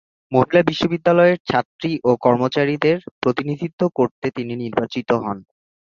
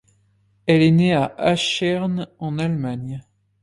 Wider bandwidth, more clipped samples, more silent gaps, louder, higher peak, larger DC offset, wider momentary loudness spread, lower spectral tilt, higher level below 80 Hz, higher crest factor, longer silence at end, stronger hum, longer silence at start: second, 7.2 kHz vs 11.5 kHz; neither; first, 1.40-1.45 s, 1.65-1.79 s, 3.11-3.22 s, 3.73-3.78 s, 4.11-4.22 s vs none; about the same, -19 LUFS vs -20 LUFS; about the same, -2 dBFS vs -4 dBFS; neither; second, 10 LU vs 14 LU; first, -7.5 dB/octave vs -6 dB/octave; about the same, -56 dBFS vs -54 dBFS; about the same, 18 dB vs 16 dB; first, 0.55 s vs 0.4 s; neither; second, 0.3 s vs 0.65 s